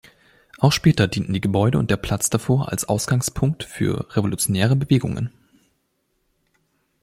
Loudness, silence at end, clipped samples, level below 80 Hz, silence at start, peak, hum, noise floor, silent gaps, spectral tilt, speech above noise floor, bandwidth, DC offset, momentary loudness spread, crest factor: -21 LUFS; 1.75 s; under 0.1%; -44 dBFS; 0.6 s; -4 dBFS; none; -70 dBFS; none; -5.5 dB/octave; 50 dB; 16 kHz; under 0.1%; 7 LU; 18 dB